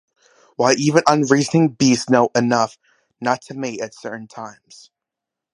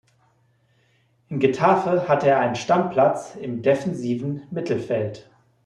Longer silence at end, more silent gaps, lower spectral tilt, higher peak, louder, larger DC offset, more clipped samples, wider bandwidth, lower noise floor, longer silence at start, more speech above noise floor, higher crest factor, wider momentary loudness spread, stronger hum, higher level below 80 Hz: first, 1 s vs 0.45 s; neither; second, -5 dB/octave vs -6.5 dB/octave; first, 0 dBFS vs -6 dBFS; first, -18 LUFS vs -22 LUFS; neither; neither; about the same, 11 kHz vs 10.5 kHz; first, -85 dBFS vs -63 dBFS; second, 0.6 s vs 1.3 s; first, 67 dB vs 42 dB; about the same, 20 dB vs 18 dB; first, 17 LU vs 11 LU; neither; about the same, -64 dBFS vs -64 dBFS